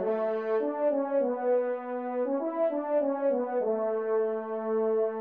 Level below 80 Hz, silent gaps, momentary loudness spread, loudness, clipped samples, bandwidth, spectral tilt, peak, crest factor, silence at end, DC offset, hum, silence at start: -84 dBFS; none; 4 LU; -29 LUFS; under 0.1%; 4.2 kHz; -6 dB/octave; -18 dBFS; 12 dB; 0 s; under 0.1%; none; 0 s